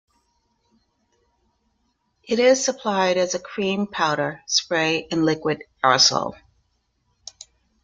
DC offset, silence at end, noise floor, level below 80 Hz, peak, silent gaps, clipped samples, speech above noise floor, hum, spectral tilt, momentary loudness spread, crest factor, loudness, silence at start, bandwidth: under 0.1%; 1.5 s; -70 dBFS; -62 dBFS; -2 dBFS; none; under 0.1%; 49 dB; none; -3 dB/octave; 13 LU; 22 dB; -21 LUFS; 2.3 s; 9.4 kHz